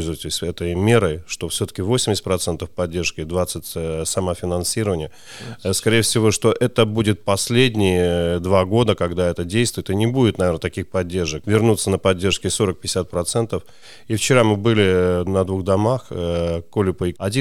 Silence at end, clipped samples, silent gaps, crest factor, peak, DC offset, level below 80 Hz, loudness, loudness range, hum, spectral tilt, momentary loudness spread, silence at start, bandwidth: 0 s; under 0.1%; none; 18 dB; -2 dBFS; under 0.1%; -46 dBFS; -20 LUFS; 4 LU; none; -5 dB/octave; 8 LU; 0 s; 17 kHz